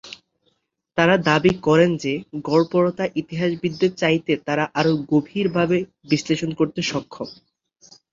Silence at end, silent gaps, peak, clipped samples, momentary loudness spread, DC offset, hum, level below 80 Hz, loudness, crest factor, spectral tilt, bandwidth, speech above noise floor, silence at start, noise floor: 0.8 s; none; -2 dBFS; under 0.1%; 11 LU; under 0.1%; none; -56 dBFS; -21 LUFS; 20 dB; -6 dB/octave; 7.6 kHz; 49 dB; 0.05 s; -69 dBFS